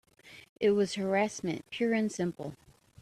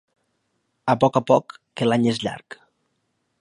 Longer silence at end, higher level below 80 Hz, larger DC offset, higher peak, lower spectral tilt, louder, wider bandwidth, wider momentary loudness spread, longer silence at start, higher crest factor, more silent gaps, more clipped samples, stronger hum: second, 0.45 s vs 0.85 s; second, -70 dBFS vs -64 dBFS; neither; second, -16 dBFS vs -2 dBFS; second, -5 dB/octave vs -6.5 dB/octave; second, -31 LUFS vs -21 LUFS; first, 13 kHz vs 11 kHz; second, 9 LU vs 13 LU; second, 0.25 s vs 0.85 s; about the same, 16 dB vs 20 dB; first, 0.49-0.56 s vs none; neither; neither